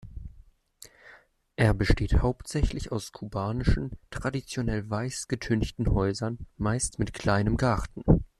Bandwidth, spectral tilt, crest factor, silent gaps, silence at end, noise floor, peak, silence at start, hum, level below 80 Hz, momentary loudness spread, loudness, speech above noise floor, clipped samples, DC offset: 13 kHz; -6 dB/octave; 20 dB; none; 0.15 s; -56 dBFS; -8 dBFS; 0.05 s; none; -34 dBFS; 11 LU; -29 LUFS; 30 dB; under 0.1%; under 0.1%